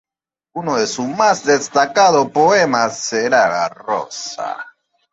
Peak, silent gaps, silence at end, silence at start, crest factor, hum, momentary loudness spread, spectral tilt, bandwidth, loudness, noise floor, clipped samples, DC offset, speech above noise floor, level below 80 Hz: -2 dBFS; none; 0.45 s; 0.55 s; 16 dB; none; 14 LU; -3 dB/octave; 8.2 kHz; -16 LUFS; -88 dBFS; under 0.1%; under 0.1%; 72 dB; -62 dBFS